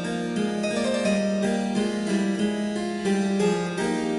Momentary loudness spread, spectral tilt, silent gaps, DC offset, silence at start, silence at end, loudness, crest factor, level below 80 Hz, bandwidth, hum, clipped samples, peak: 3 LU; -5.5 dB/octave; none; under 0.1%; 0 s; 0 s; -25 LUFS; 14 dB; -58 dBFS; 11.5 kHz; none; under 0.1%; -12 dBFS